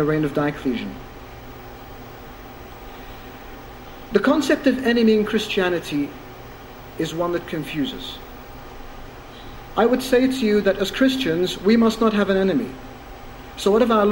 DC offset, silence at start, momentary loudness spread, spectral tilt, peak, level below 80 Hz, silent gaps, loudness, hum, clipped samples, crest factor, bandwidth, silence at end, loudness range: under 0.1%; 0 s; 22 LU; -5.5 dB/octave; -2 dBFS; -44 dBFS; none; -20 LUFS; none; under 0.1%; 20 dB; 17 kHz; 0 s; 10 LU